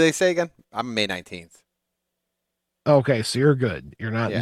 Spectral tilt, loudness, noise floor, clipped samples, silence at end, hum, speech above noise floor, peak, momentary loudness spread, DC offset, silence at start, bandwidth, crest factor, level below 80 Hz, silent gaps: -5.5 dB/octave; -23 LUFS; -80 dBFS; under 0.1%; 0 s; none; 59 dB; -4 dBFS; 13 LU; under 0.1%; 0 s; 14.5 kHz; 18 dB; -60 dBFS; none